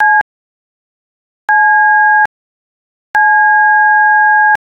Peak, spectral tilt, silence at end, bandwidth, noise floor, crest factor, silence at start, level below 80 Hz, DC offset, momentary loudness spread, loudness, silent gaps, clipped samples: -2 dBFS; -2 dB/octave; 0.05 s; 5.8 kHz; under -90 dBFS; 10 dB; 0 s; -60 dBFS; under 0.1%; 9 LU; -8 LUFS; 0.21-1.48 s, 2.26-3.14 s; under 0.1%